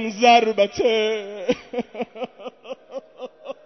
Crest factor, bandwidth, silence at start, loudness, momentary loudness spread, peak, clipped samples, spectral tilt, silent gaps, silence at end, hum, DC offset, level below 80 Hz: 20 dB; 6.4 kHz; 0 s; -20 LUFS; 23 LU; -2 dBFS; under 0.1%; -3.5 dB/octave; none; 0.15 s; none; under 0.1%; -60 dBFS